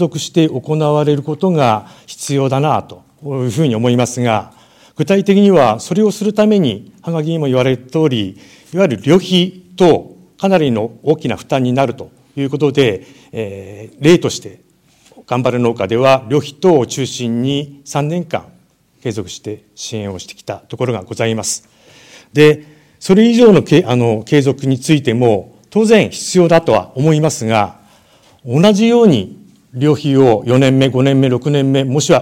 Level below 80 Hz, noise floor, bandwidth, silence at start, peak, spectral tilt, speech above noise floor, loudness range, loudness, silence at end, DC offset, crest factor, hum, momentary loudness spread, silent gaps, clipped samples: -52 dBFS; -52 dBFS; 16 kHz; 0 s; 0 dBFS; -6 dB/octave; 39 dB; 6 LU; -14 LUFS; 0 s; under 0.1%; 14 dB; none; 14 LU; none; under 0.1%